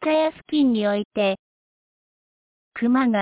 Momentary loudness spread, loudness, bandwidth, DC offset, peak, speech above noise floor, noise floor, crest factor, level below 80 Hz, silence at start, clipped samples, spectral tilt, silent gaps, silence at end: 8 LU; -22 LUFS; 4 kHz; under 0.1%; -10 dBFS; over 70 dB; under -90 dBFS; 12 dB; -64 dBFS; 0 s; under 0.1%; -10 dB/octave; 1.05-1.11 s, 1.39-2.72 s; 0 s